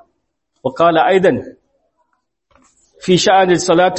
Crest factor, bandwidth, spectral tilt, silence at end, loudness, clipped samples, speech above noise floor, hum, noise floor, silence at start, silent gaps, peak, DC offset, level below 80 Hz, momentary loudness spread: 16 dB; 8.6 kHz; -4.5 dB/octave; 0 s; -13 LUFS; under 0.1%; 57 dB; none; -69 dBFS; 0.65 s; none; 0 dBFS; under 0.1%; -54 dBFS; 14 LU